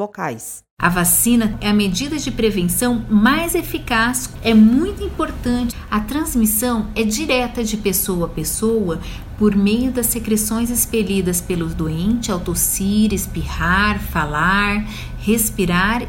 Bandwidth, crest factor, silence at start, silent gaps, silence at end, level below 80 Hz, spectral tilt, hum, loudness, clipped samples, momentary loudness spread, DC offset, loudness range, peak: 16.5 kHz; 18 dB; 0 s; 0.71-0.77 s; 0 s; -32 dBFS; -4 dB/octave; none; -18 LUFS; under 0.1%; 9 LU; under 0.1%; 2 LU; 0 dBFS